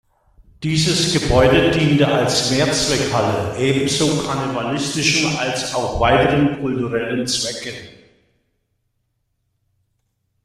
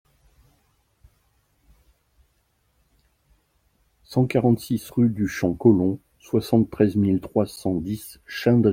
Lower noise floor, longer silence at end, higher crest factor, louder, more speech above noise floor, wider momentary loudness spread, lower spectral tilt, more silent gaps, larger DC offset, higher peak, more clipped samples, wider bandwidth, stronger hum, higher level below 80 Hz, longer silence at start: about the same, -70 dBFS vs -68 dBFS; first, 2.55 s vs 0 s; about the same, 18 dB vs 20 dB; first, -17 LUFS vs -22 LUFS; first, 53 dB vs 47 dB; about the same, 7 LU vs 9 LU; second, -4 dB/octave vs -7.5 dB/octave; neither; neither; first, 0 dBFS vs -4 dBFS; neither; second, 14.5 kHz vs 16.5 kHz; neither; first, -38 dBFS vs -54 dBFS; second, 0.6 s vs 4.1 s